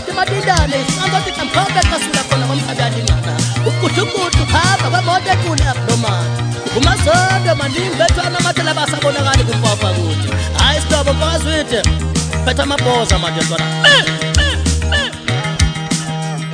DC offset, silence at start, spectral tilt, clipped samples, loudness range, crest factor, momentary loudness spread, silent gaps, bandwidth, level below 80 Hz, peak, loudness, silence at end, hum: under 0.1%; 0 s; -4 dB/octave; under 0.1%; 2 LU; 14 dB; 5 LU; none; 13.5 kHz; -24 dBFS; 0 dBFS; -14 LUFS; 0 s; none